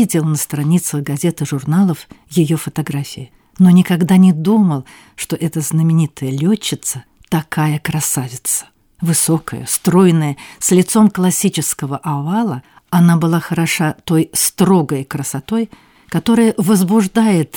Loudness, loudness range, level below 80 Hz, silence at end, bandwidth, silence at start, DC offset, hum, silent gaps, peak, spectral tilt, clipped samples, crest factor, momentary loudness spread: -15 LUFS; 4 LU; -52 dBFS; 0 s; 19 kHz; 0 s; under 0.1%; none; none; -2 dBFS; -5.5 dB/octave; under 0.1%; 14 dB; 10 LU